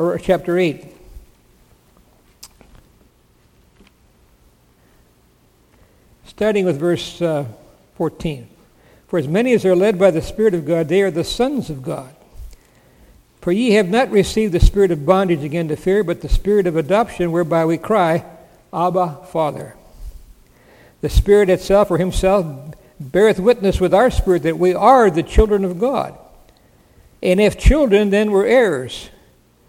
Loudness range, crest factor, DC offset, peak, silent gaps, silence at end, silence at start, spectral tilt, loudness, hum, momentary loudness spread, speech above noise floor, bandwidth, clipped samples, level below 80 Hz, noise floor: 8 LU; 18 dB; under 0.1%; 0 dBFS; none; 0.6 s; 0 s; -6.5 dB/octave; -17 LUFS; none; 13 LU; 39 dB; 16.5 kHz; under 0.1%; -28 dBFS; -55 dBFS